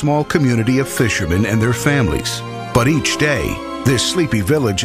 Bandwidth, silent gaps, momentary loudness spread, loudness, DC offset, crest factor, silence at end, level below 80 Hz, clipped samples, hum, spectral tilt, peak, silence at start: 16 kHz; none; 5 LU; -16 LUFS; under 0.1%; 16 dB; 0 s; -34 dBFS; under 0.1%; none; -5 dB/octave; 0 dBFS; 0 s